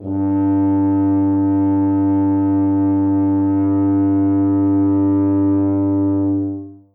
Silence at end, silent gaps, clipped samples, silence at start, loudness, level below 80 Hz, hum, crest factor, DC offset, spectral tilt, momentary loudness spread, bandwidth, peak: 0.2 s; none; under 0.1%; 0 s; -16 LUFS; -64 dBFS; none; 6 dB; under 0.1%; -14 dB/octave; 2 LU; 2.3 kHz; -10 dBFS